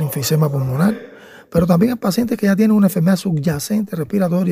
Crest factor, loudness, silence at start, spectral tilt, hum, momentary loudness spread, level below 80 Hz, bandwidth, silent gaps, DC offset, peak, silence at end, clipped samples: 16 dB; -17 LUFS; 0 s; -6.5 dB/octave; none; 7 LU; -46 dBFS; 16 kHz; none; under 0.1%; 0 dBFS; 0 s; under 0.1%